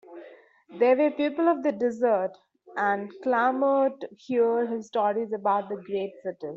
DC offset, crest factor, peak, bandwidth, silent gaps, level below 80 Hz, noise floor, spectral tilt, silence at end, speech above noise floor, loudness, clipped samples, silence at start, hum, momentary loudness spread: under 0.1%; 16 dB; -10 dBFS; 7.6 kHz; none; -76 dBFS; -51 dBFS; -4 dB/octave; 0 s; 26 dB; -26 LUFS; under 0.1%; 0.1 s; none; 11 LU